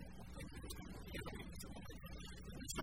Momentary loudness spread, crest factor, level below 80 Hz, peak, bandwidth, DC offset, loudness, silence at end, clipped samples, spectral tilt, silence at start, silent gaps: 4 LU; 20 dB; -56 dBFS; -30 dBFS; 19.5 kHz; under 0.1%; -52 LUFS; 0 s; under 0.1%; -4 dB/octave; 0 s; none